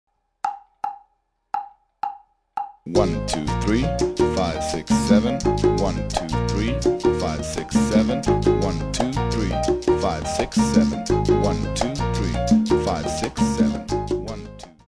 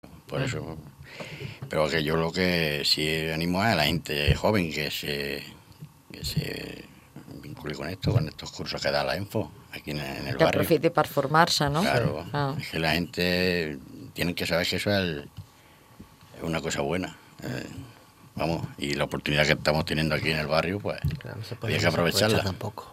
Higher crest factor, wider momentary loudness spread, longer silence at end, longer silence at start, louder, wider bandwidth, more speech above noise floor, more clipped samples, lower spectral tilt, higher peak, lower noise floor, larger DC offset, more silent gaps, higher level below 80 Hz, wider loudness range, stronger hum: second, 18 dB vs 24 dB; about the same, 13 LU vs 15 LU; first, 0.15 s vs 0 s; first, 0.45 s vs 0.05 s; first, -22 LUFS vs -26 LUFS; second, 11 kHz vs 16 kHz; first, 47 dB vs 28 dB; neither; about the same, -6 dB/octave vs -5 dB/octave; about the same, -4 dBFS vs -4 dBFS; first, -67 dBFS vs -54 dBFS; neither; neither; first, -34 dBFS vs -46 dBFS; second, 4 LU vs 8 LU; neither